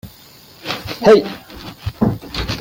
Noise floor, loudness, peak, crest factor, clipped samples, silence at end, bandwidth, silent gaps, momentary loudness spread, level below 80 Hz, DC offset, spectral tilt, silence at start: -43 dBFS; -16 LUFS; 0 dBFS; 18 dB; under 0.1%; 0 s; 17 kHz; none; 20 LU; -38 dBFS; under 0.1%; -6 dB/octave; 0.05 s